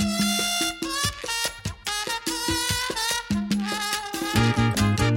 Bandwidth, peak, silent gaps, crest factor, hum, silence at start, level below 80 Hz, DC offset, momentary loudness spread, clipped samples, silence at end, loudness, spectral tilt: 16.5 kHz; -6 dBFS; none; 18 dB; none; 0 s; -42 dBFS; under 0.1%; 5 LU; under 0.1%; 0 s; -24 LUFS; -3.5 dB/octave